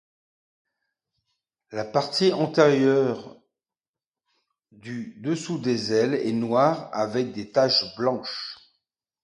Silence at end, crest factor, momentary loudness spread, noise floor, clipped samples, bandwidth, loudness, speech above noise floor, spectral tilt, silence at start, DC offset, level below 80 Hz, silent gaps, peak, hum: 0.7 s; 22 dB; 15 LU; under -90 dBFS; under 0.1%; 11 kHz; -23 LUFS; over 67 dB; -5.5 dB/octave; 1.7 s; under 0.1%; -70 dBFS; 3.88-3.94 s, 4.07-4.12 s; -4 dBFS; none